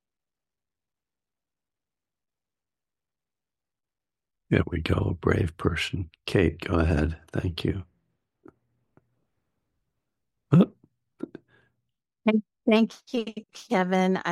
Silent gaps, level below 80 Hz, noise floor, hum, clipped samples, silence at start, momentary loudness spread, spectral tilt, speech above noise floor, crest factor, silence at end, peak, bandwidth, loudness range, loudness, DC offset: none; -44 dBFS; under -90 dBFS; none; under 0.1%; 4.5 s; 13 LU; -7 dB/octave; over 65 dB; 24 dB; 0 s; -4 dBFS; 12.5 kHz; 7 LU; -26 LUFS; under 0.1%